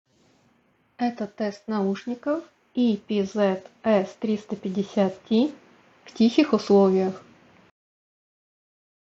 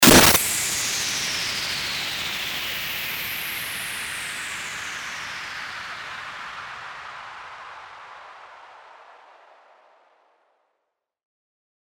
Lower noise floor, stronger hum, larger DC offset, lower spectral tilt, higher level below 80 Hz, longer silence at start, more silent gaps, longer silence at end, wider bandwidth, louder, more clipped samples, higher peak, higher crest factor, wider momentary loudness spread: second, -65 dBFS vs -79 dBFS; neither; neither; first, -7 dB/octave vs -2 dB/octave; second, -68 dBFS vs -48 dBFS; first, 1 s vs 0 s; neither; second, 1.9 s vs 2.8 s; second, 7.8 kHz vs over 20 kHz; about the same, -24 LUFS vs -23 LUFS; neither; second, -6 dBFS vs 0 dBFS; second, 20 dB vs 26 dB; second, 11 LU vs 18 LU